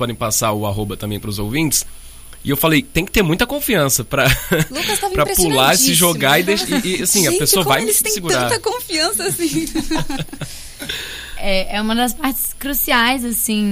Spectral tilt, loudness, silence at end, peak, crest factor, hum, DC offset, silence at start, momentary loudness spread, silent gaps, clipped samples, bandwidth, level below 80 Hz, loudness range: -3 dB/octave; -16 LUFS; 0 s; 0 dBFS; 16 dB; none; under 0.1%; 0 s; 12 LU; none; under 0.1%; 16 kHz; -32 dBFS; 7 LU